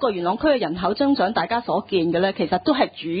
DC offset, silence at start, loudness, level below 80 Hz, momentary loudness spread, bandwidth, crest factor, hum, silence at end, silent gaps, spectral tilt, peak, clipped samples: under 0.1%; 0 s; -21 LUFS; -52 dBFS; 3 LU; 5 kHz; 16 dB; none; 0 s; none; -10.5 dB/octave; -6 dBFS; under 0.1%